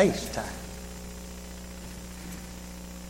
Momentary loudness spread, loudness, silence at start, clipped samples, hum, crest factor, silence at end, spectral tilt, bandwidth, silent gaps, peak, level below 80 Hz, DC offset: 9 LU; -36 LUFS; 0 s; under 0.1%; 60 Hz at -40 dBFS; 24 dB; 0 s; -4.5 dB/octave; 16.5 kHz; none; -8 dBFS; -44 dBFS; under 0.1%